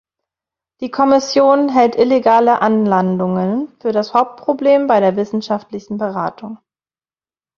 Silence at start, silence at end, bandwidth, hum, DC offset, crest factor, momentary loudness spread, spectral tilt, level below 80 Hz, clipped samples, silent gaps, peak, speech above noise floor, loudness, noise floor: 0.8 s; 1 s; 7.2 kHz; none; under 0.1%; 14 dB; 11 LU; -6.5 dB/octave; -60 dBFS; under 0.1%; none; -2 dBFS; over 76 dB; -15 LUFS; under -90 dBFS